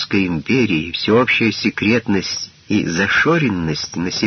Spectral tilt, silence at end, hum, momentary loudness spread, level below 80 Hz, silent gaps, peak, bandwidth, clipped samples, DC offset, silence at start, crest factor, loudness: -3.5 dB/octave; 0 s; none; 8 LU; -46 dBFS; none; -2 dBFS; 6.6 kHz; under 0.1%; under 0.1%; 0 s; 14 dB; -17 LUFS